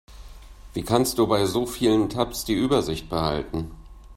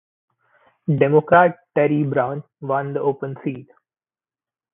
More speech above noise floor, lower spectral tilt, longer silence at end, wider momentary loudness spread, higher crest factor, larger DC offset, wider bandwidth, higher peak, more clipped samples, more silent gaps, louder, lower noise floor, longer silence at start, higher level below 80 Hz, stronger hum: second, 20 dB vs over 71 dB; second, -5 dB/octave vs -12.5 dB/octave; second, 0 s vs 1.1 s; second, 11 LU vs 15 LU; about the same, 22 dB vs 20 dB; neither; first, 16 kHz vs 3.8 kHz; about the same, -4 dBFS vs -2 dBFS; neither; neither; second, -24 LUFS vs -19 LUFS; second, -43 dBFS vs under -90 dBFS; second, 0.1 s vs 0.9 s; first, -42 dBFS vs -62 dBFS; neither